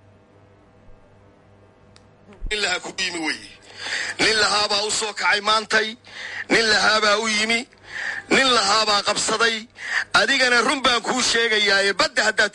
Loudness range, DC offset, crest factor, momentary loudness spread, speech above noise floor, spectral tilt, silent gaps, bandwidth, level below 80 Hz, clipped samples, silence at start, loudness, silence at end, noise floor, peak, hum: 10 LU; under 0.1%; 16 dB; 12 LU; 32 dB; -1 dB/octave; none; 11.5 kHz; -48 dBFS; under 0.1%; 0.9 s; -19 LUFS; 0.05 s; -52 dBFS; -6 dBFS; none